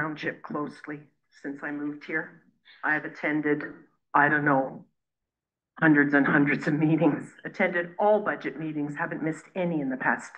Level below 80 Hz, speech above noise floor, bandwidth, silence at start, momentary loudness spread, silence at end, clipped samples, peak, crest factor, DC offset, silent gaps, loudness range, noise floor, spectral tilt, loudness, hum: -76 dBFS; 63 dB; 8.8 kHz; 0 s; 15 LU; 0 s; under 0.1%; -8 dBFS; 20 dB; under 0.1%; none; 7 LU; -89 dBFS; -7.5 dB/octave; -26 LUFS; none